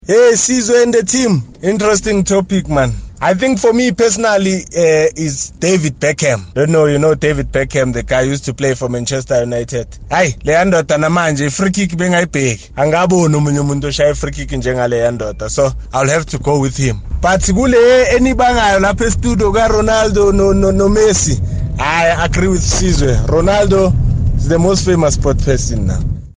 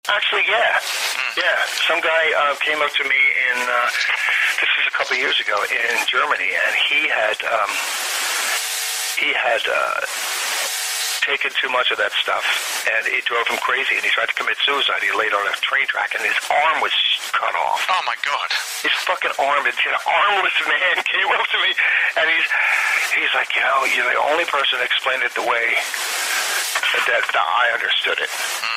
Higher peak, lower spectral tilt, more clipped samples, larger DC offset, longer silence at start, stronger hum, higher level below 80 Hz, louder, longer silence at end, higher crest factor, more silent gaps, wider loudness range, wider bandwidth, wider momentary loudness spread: first, -2 dBFS vs -6 dBFS; first, -5 dB/octave vs 1.5 dB/octave; neither; neither; about the same, 0.05 s vs 0.05 s; neither; first, -24 dBFS vs -68 dBFS; first, -13 LUFS vs -18 LUFS; about the same, 0.05 s vs 0 s; about the same, 10 dB vs 14 dB; neither; about the same, 4 LU vs 3 LU; second, 10 kHz vs 16 kHz; first, 7 LU vs 4 LU